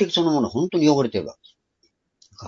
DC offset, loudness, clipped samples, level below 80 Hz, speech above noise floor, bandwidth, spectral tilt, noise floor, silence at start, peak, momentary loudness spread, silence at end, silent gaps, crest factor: under 0.1%; -21 LUFS; under 0.1%; -62 dBFS; 48 dB; 7.4 kHz; -5.5 dB/octave; -68 dBFS; 0 s; -4 dBFS; 10 LU; 0 s; none; 18 dB